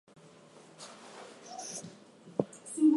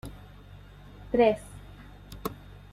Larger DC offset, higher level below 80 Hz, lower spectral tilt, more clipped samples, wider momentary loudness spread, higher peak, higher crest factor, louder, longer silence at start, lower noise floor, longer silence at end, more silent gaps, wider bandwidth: neither; second, -78 dBFS vs -50 dBFS; about the same, -5 dB/octave vs -6 dB/octave; neither; second, 19 LU vs 26 LU; about the same, -12 dBFS vs -10 dBFS; about the same, 24 dB vs 22 dB; second, -38 LUFS vs -28 LUFS; first, 0.8 s vs 0.05 s; first, -56 dBFS vs -49 dBFS; second, 0 s vs 0.4 s; neither; second, 11.5 kHz vs 16 kHz